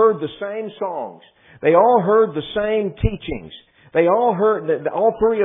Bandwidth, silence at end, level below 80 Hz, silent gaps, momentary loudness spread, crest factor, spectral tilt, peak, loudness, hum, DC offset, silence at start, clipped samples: 3.8 kHz; 0 s; -38 dBFS; none; 14 LU; 18 dB; -11 dB/octave; 0 dBFS; -19 LUFS; none; under 0.1%; 0 s; under 0.1%